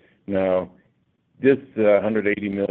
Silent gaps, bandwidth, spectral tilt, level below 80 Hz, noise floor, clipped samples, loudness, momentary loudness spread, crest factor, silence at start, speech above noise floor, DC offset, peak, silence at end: none; 4.1 kHz; -10 dB/octave; -64 dBFS; -65 dBFS; under 0.1%; -21 LUFS; 7 LU; 18 dB; 0.3 s; 45 dB; under 0.1%; -4 dBFS; 0.05 s